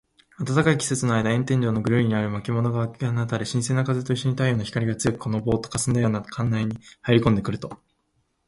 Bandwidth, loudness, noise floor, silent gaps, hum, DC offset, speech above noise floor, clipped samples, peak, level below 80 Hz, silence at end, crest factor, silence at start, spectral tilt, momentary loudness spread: 11.5 kHz; -24 LUFS; -70 dBFS; none; none; under 0.1%; 48 dB; under 0.1%; -4 dBFS; -50 dBFS; 0.75 s; 20 dB; 0.4 s; -6 dB/octave; 6 LU